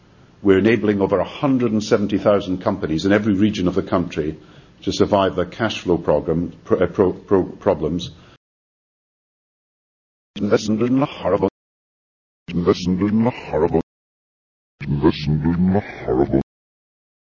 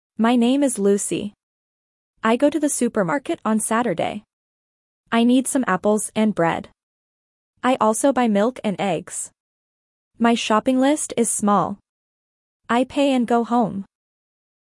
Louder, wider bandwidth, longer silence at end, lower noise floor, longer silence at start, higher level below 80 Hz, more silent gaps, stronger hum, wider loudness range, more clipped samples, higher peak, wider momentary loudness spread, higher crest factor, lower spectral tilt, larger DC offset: about the same, -19 LUFS vs -20 LUFS; second, 7.4 kHz vs 12 kHz; about the same, 0.9 s vs 0.8 s; about the same, under -90 dBFS vs under -90 dBFS; first, 0.4 s vs 0.2 s; first, -42 dBFS vs -62 dBFS; first, 8.37-10.34 s, 11.51-12.46 s, 13.83-14.78 s vs 1.43-2.14 s, 4.33-5.04 s, 6.83-7.54 s, 9.40-10.11 s, 11.89-12.60 s; neither; first, 5 LU vs 2 LU; neither; about the same, -2 dBFS vs -4 dBFS; about the same, 9 LU vs 9 LU; about the same, 18 dB vs 16 dB; first, -7 dB/octave vs -4.5 dB/octave; neither